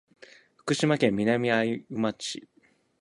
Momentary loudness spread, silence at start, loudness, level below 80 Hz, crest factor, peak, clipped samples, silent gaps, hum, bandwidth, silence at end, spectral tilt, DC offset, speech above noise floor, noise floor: 12 LU; 0.65 s; -27 LUFS; -66 dBFS; 20 dB; -8 dBFS; under 0.1%; none; none; 11.5 kHz; 0.6 s; -5 dB/octave; under 0.1%; 28 dB; -54 dBFS